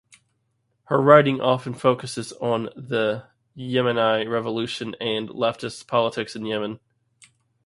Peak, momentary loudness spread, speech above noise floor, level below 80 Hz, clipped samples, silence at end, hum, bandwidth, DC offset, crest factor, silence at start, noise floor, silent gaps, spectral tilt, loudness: 0 dBFS; 14 LU; 49 dB; -66 dBFS; under 0.1%; 0.9 s; none; 11.5 kHz; under 0.1%; 24 dB; 0.9 s; -71 dBFS; none; -5.5 dB/octave; -23 LUFS